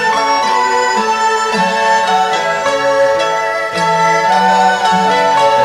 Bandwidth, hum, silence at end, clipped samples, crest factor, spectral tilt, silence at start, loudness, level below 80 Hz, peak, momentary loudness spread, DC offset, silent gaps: 15.5 kHz; none; 0 s; under 0.1%; 12 dB; -3 dB/octave; 0 s; -12 LUFS; -52 dBFS; 0 dBFS; 3 LU; under 0.1%; none